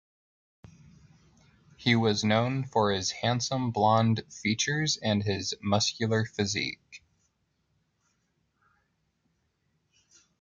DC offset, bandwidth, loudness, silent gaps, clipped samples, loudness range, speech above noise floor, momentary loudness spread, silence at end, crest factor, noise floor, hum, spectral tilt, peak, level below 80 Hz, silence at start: under 0.1%; 8.8 kHz; -27 LUFS; none; under 0.1%; 8 LU; 48 dB; 6 LU; 3.45 s; 20 dB; -75 dBFS; none; -4.5 dB/octave; -10 dBFS; -66 dBFS; 1.8 s